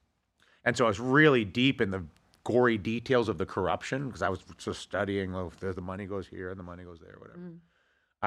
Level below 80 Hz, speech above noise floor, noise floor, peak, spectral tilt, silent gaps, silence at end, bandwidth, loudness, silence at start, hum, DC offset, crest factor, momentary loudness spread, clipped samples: -60 dBFS; 42 dB; -72 dBFS; -8 dBFS; -6 dB/octave; none; 0 s; 11.5 kHz; -29 LUFS; 0.65 s; none; under 0.1%; 22 dB; 22 LU; under 0.1%